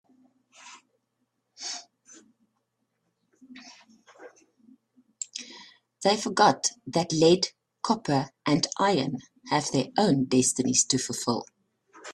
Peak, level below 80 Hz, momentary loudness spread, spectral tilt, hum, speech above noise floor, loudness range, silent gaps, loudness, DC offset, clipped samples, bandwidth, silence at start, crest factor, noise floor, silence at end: -4 dBFS; -68 dBFS; 17 LU; -3.5 dB/octave; none; 53 dB; 19 LU; none; -25 LUFS; under 0.1%; under 0.1%; 13 kHz; 0.65 s; 24 dB; -78 dBFS; 0 s